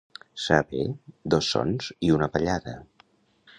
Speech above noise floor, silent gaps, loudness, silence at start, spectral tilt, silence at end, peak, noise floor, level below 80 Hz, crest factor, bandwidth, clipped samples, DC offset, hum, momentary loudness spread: 36 dB; none; -26 LUFS; 0.35 s; -5.5 dB/octave; 0.75 s; -4 dBFS; -61 dBFS; -48 dBFS; 24 dB; 10 kHz; under 0.1%; under 0.1%; none; 15 LU